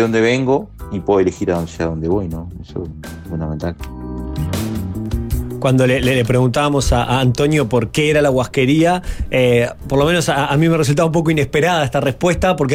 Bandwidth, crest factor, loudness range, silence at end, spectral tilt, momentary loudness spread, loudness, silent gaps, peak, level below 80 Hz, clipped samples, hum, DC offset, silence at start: 16 kHz; 12 dB; 8 LU; 0 s; -6 dB/octave; 12 LU; -16 LUFS; none; -4 dBFS; -30 dBFS; under 0.1%; none; under 0.1%; 0 s